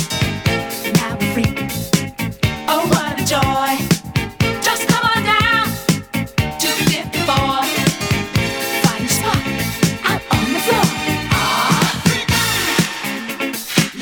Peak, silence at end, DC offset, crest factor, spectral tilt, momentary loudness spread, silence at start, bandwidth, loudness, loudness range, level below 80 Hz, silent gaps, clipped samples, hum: 0 dBFS; 0 s; under 0.1%; 18 dB; -4 dB/octave; 6 LU; 0 s; over 20 kHz; -17 LUFS; 2 LU; -36 dBFS; none; under 0.1%; none